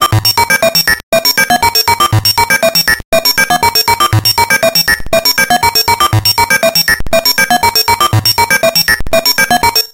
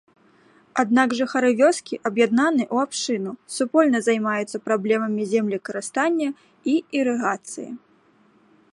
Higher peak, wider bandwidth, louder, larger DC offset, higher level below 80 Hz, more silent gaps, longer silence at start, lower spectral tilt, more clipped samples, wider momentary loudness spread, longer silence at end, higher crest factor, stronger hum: first, 0 dBFS vs -4 dBFS; first, 17.5 kHz vs 11.5 kHz; first, -8 LUFS vs -22 LUFS; neither; first, -30 dBFS vs -74 dBFS; first, 1.03-1.12 s, 3.05-3.12 s vs none; second, 0 s vs 0.75 s; second, -2.5 dB/octave vs -4.5 dB/octave; neither; second, 2 LU vs 10 LU; second, 0.05 s vs 0.95 s; second, 10 dB vs 18 dB; neither